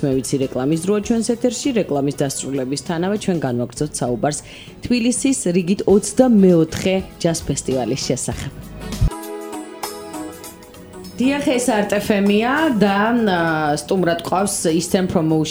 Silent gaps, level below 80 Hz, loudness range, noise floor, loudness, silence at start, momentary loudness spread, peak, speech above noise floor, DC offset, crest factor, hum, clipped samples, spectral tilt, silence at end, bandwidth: none; -38 dBFS; 7 LU; -38 dBFS; -18 LUFS; 0 s; 14 LU; 0 dBFS; 20 dB; under 0.1%; 18 dB; none; under 0.1%; -5 dB/octave; 0 s; over 20 kHz